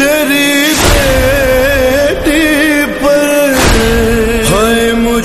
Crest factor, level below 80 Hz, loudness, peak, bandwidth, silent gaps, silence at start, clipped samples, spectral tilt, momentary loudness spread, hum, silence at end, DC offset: 8 dB; -20 dBFS; -9 LUFS; 0 dBFS; 14 kHz; none; 0 s; under 0.1%; -4 dB/octave; 2 LU; none; 0 s; 0.6%